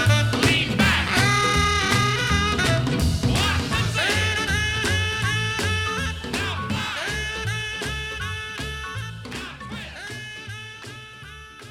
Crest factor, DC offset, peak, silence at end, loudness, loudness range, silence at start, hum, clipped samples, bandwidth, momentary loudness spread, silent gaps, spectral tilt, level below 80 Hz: 18 dB; under 0.1%; -4 dBFS; 0 s; -22 LUFS; 12 LU; 0 s; none; under 0.1%; 17 kHz; 15 LU; none; -4 dB/octave; -36 dBFS